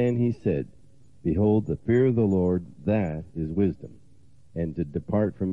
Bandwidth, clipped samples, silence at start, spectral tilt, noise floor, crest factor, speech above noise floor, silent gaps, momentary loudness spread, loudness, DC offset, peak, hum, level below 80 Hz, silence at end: 7.4 kHz; under 0.1%; 0 s; -10.5 dB/octave; -57 dBFS; 14 dB; 33 dB; none; 11 LU; -26 LUFS; 0.3%; -12 dBFS; none; -50 dBFS; 0 s